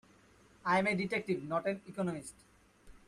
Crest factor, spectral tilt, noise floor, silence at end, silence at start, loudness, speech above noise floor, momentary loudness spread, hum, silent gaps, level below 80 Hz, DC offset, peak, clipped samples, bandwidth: 18 dB; -5.5 dB/octave; -63 dBFS; 0.1 s; 0.65 s; -35 LUFS; 29 dB; 11 LU; none; none; -68 dBFS; under 0.1%; -18 dBFS; under 0.1%; 12.5 kHz